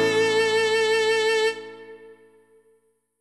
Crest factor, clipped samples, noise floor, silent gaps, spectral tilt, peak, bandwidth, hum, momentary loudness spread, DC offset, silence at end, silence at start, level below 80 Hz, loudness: 12 dB; under 0.1%; -65 dBFS; none; -2 dB/octave; -12 dBFS; 12.5 kHz; none; 18 LU; under 0.1%; 1.1 s; 0 s; -76 dBFS; -21 LUFS